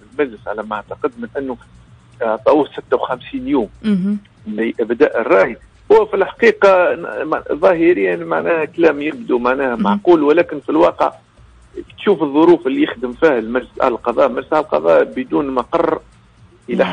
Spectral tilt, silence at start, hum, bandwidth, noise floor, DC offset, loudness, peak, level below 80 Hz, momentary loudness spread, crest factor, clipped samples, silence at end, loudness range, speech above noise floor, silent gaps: -7 dB/octave; 0.15 s; none; 9.4 kHz; -47 dBFS; under 0.1%; -16 LUFS; -2 dBFS; -50 dBFS; 12 LU; 14 dB; under 0.1%; 0 s; 5 LU; 31 dB; none